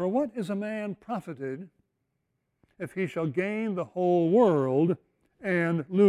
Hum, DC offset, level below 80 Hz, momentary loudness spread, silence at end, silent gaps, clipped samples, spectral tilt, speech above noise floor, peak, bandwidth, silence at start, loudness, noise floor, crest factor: none; under 0.1%; -72 dBFS; 15 LU; 0 s; none; under 0.1%; -8.5 dB/octave; 52 dB; -10 dBFS; 11.5 kHz; 0 s; -28 LUFS; -79 dBFS; 16 dB